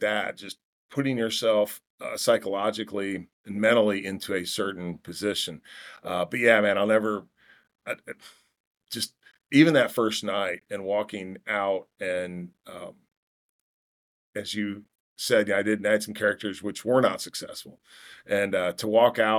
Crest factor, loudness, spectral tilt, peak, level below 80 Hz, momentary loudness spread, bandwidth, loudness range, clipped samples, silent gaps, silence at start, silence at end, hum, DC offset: 22 dB; -26 LUFS; -4.5 dB/octave; -4 dBFS; -76 dBFS; 19 LU; 19 kHz; 7 LU; under 0.1%; 0.64-0.89 s, 1.90-1.98 s, 3.33-3.44 s, 8.60-8.75 s, 13.17-14.33 s, 15.00-15.16 s; 0 s; 0 s; none; under 0.1%